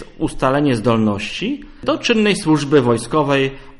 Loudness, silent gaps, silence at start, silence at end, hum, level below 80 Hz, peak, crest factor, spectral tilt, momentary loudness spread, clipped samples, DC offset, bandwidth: -17 LUFS; none; 0 s; 0 s; none; -40 dBFS; -2 dBFS; 16 dB; -5.5 dB/octave; 8 LU; under 0.1%; under 0.1%; 11.5 kHz